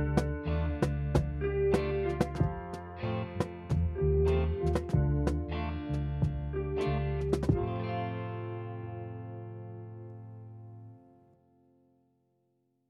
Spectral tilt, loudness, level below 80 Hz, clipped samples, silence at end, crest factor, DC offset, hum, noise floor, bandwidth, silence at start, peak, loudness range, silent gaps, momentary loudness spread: -8 dB/octave; -32 LUFS; -40 dBFS; under 0.1%; 1.9 s; 20 dB; under 0.1%; none; -75 dBFS; 11.5 kHz; 0 s; -12 dBFS; 15 LU; none; 16 LU